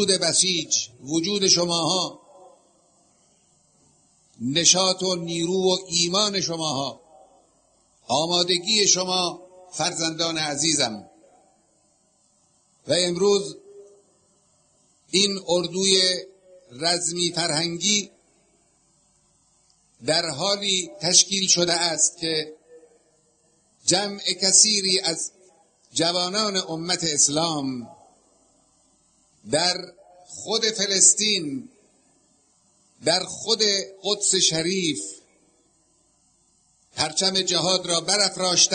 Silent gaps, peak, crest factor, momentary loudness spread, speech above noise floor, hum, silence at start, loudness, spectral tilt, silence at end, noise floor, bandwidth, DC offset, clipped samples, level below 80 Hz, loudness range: none; -2 dBFS; 22 dB; 12 LU; 41 dB; none; 0 s; -21 LUFS; -1.5 dB/octave; 0 s; -64 dBFS; 9.6 kHz; under 0.1%; under 0.1%; -66 dBFS; 6 LU